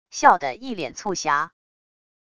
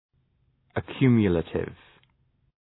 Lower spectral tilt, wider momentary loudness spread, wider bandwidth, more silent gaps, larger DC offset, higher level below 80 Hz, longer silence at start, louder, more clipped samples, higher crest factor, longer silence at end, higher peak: second, -2.5 dB/octave vs -11.5 dB/octave; about the same, 13 LU vs 15 LU; first, 10 kHz vs 4.1 kHz; neither; neither; second, -60 dBFS vs -52 dBFS; second, 0.15 s vs 0.75 s; first, -22 LUFS vs -25 LUFS; neither; about the same, 24 dB vs 20 dB; second, 0.75 s vs 0.9 s; first, 0 dBFS vs -8 dBFS